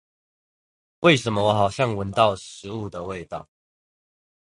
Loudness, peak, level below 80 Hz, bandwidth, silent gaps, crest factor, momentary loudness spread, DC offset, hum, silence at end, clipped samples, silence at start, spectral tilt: -22 LUFS; -4 dBFS; -52 dBFS; 11.5 kHz; none; 22 dB; 15 LU; under 0.1%; none; 1.05 s; under 0.1%; 1 s; -5.5 dB/octave